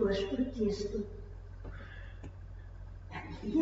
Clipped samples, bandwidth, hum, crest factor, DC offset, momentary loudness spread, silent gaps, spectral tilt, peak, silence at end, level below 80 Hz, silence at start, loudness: under 0.1%; 7.6 kHz; none; 18 dB; under 0.1%; 17 LU; none; -6 dB/octave; -20 dBFS; 0 s; -48 dBFS; 0 s; -38 LUFS